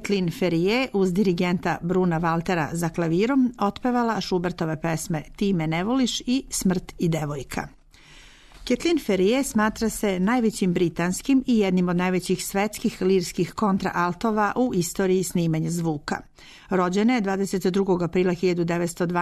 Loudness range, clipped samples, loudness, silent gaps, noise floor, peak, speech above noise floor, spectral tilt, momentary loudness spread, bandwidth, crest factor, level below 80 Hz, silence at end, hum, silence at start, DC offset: 3 LU; under 0.1%; -24 LUFS; none; -49 dBFS; -12 dBFS; 26 dB; -5.5 dB/octave; 6 LU; 13.5 kHz; 12 dB; -48 dBFS; 0 s; none; 0 s; under 0.1%